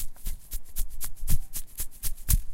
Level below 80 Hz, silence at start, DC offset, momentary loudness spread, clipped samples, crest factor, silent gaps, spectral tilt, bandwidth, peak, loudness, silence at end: -30 dBFS; 0 s; under 0.1%; 10 LU; under 0.1%; 18 dB; none; -3 dB/octave; 16.5 kHz; -8 dBFS; -34 LUFS; 0 s